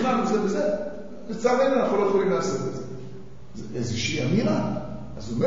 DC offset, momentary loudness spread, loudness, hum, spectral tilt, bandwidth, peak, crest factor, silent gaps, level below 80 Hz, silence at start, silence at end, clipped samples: 1%; 17 LU; -25 LUFS; none; -6 dB/octave; 7.8 kHz; -8 dBFS; 16 dB; none; -52 dBFS; 0 s; 0 s; under 0.1%